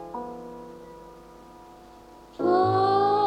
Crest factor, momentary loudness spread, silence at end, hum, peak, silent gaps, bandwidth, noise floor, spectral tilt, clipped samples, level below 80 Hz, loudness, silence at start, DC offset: 16 dB; 24 LU; 0 s; none; -10 dBFS; none; 9 kHz; -49 dBFS; -7.5 dB/octave; under 0.1%; -60 dBFS; -23 LUFS; 0 s; under 0.1%